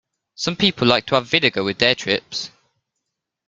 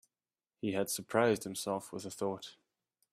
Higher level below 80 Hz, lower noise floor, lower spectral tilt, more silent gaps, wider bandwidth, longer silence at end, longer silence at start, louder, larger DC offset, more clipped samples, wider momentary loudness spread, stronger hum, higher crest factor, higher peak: first, -56 dBFS vs -76 dBFS; second, -80 dBFS vs under -90 dBFS; about the same, -4 dB/octave vs -4 dB/octave; neither; second, 9.2 kHz vs 15.5 kHz; first, 1 s vs 0.6 s; second, 0.4 s vs 0.65 s; first, -18 LUFS vs -35 LUFS; neither; neither; about the same, 11 LU vs 13 LU; neither; about the same, 22 dB vs 24 dB; first, 0 dBFS vs -14 dBFS